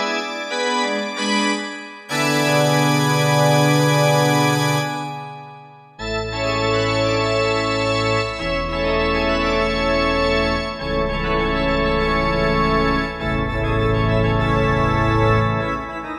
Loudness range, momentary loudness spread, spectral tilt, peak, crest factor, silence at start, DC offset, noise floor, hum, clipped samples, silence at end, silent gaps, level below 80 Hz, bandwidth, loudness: 3 LU; 9 LU; -5 dB/octave; -4 dBFS; 14 dB; 0 s; under 0.1%; -41 dBFS; none; under 0.1%; 0 s; none; -32 dBFS; 14 kHz; -19 LUFS